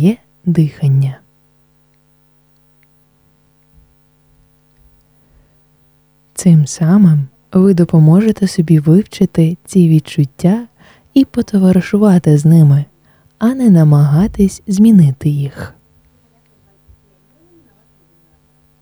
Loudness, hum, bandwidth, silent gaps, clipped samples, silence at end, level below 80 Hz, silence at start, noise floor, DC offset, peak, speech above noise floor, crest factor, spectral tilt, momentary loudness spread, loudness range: -11 LUFS; none; over 20 kHz; none; under 0.1%; 3.15 s; -44 dBFS; 0 s; -54 dBFS; under 0.1%; 0 dBFS; 44 dB; 12 dB; -8 dB/octave; 9 LU; 9 LU